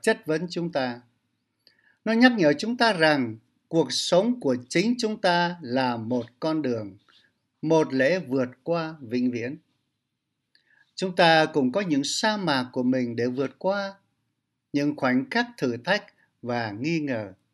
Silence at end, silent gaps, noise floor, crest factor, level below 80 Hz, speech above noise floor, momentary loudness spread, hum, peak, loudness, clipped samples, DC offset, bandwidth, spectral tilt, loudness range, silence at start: 0.2 s; none; -80 dBFS; 22 dB; -74 dBFS; 56 dB; 12 LU; none; -4 dBFS; -25 LUFS; under 0.1%; under 0.1%; 12 kHz; -5 dB/octave; 5 LU; 0.05 s